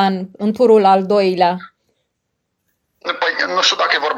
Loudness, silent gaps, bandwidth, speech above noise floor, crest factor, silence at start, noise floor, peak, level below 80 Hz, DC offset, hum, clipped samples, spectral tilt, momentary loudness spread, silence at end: -15 LUFS; none; 10 kHz; 59 dB; 16 dB; 0 s; -73 dBFS; -2 dBFS; -68 dBFS; under 0.1%; none; under 0.1%; -4 dB/octave; 12 LU; 0 s